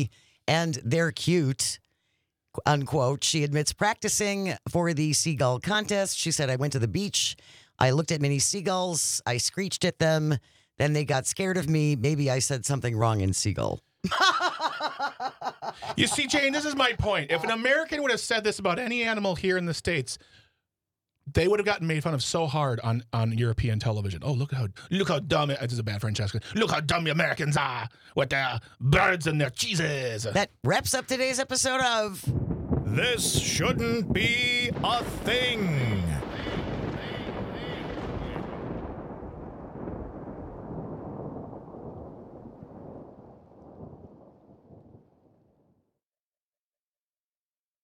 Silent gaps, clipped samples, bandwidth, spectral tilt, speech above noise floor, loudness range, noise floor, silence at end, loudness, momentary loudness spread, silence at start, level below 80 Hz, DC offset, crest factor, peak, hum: none; under 0.1%; 16.5 kHz; -4 dB/octave; over 64 dB; 12 LU; under -90 dBFS; 3.05 s; -26 LUFS; 15 LU; 0 s; -50 dBFS; under 0.1%; 20 dB; -8 dBFS; none